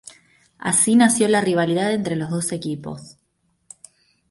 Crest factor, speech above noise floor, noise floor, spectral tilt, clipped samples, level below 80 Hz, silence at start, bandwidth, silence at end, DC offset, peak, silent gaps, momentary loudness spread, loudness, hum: 16 dB; 49 dB; -68 dBFS; -4 dB/octave; under 0.1%; -62 dBFS; 0.05 s; 11.5 kHz; 1.2 s; under 0.1%; -4 dBFS; none; 15 LU; -19 LUFS; none